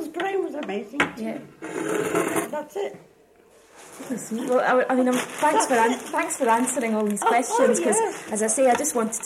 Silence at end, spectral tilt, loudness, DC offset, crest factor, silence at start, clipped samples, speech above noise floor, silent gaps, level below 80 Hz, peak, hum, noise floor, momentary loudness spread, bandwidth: 0 s; -3 dB/octave; -23 LUFS; under 0.1%; 16 dB; 0 s; under 0.1%; 32 dB; none; -68 dBFS; -8 dBFS; none; -55 dBFS; 12 LU; 16.5 kHz